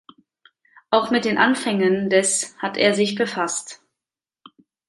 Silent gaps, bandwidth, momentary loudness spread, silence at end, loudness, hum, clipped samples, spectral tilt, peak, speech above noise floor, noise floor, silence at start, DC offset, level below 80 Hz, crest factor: none; 11.5 kHz; 7 LU; 1.15 s; -20 LUFS; none; under 0.1%; -3 dB/octave; -2 dBFS; 69 dB; -89 dBFS; 0.9 s; under 0.1%; -68 dBFS; 20 dB